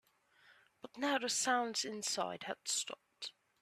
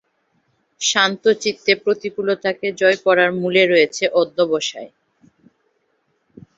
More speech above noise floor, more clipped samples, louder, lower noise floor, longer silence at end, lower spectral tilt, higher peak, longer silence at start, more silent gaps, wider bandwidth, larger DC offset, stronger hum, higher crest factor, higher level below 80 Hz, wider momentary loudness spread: second, 31 dB vs 49 dB; neither; second, -37 LUFS vs -17 LUFS; about the same, -68 dBFS vs -67 dBFS; second, 0.3 s vs 1.7 s; second, -1 dB/octave vs -3 dB/octave; second, -20 dBFS vs -2 dBFS; second, 0.5 s vs 0.8 s; neither; first, 15 kHz vs 8 kHz; neither; neither; about the same, 20 dB vs 18 dB; second, -86 dBFS vs -66 dBFS; first, 15 LU vs 7 LU